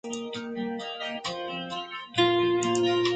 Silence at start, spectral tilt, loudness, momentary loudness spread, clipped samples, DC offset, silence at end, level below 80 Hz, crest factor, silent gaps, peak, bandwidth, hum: 0.05 s; -4 dB/octave; -28 LUFS; 11 LU; under 0.1%; under 0.1%; 0 s; -66 dBFS; 18 dB; none; -10 dBFS; 9.2 kHz; none